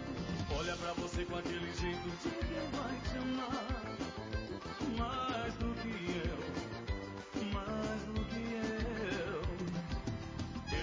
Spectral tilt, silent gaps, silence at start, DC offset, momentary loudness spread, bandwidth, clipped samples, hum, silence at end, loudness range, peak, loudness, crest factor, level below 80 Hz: -5.5 dB/octave; none; 0 s; under 0.1%; 5 LU; 7.6 kHz; under 0.1%; none; 0 s; 1 LU; -26 dBFS; -40 LUFS; 12 dB; -46 dBFS